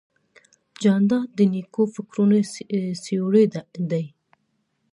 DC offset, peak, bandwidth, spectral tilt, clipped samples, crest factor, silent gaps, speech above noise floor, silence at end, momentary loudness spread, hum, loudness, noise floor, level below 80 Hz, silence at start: under 0.1%; -6 dBFS; 11 kHz; -7.5 dB/octave; under 0.1%; 16 dB; none; 50 dB; 0.85 s; 8 LU; none; -22 LUFS; -71 dBFS; -72 dBFS; 0.8 s